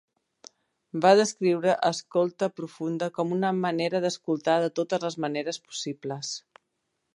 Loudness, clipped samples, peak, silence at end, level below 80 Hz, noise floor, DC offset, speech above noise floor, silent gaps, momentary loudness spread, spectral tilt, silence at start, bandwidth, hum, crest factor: -26 LUFS; under 0.1%; -6 dBFS; 0.75 s; -78 dBFS; -79 dBFS; under 0.1%; 53 dB; none; 13 LU; -4.5 dB/octave; 0.95 s; 11.5 kHz; none; 22 dB